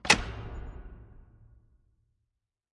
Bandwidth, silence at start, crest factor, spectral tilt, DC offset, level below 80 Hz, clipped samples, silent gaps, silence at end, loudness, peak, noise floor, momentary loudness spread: 11.5 kHz; 0.05 s; 30 dB; -2 dB/octave; under 0.1%; -46 dBFS; under 0.1%; none; 1.55 s; -29 LUFS; -6 dBFS; -84 dBFS; 27 LU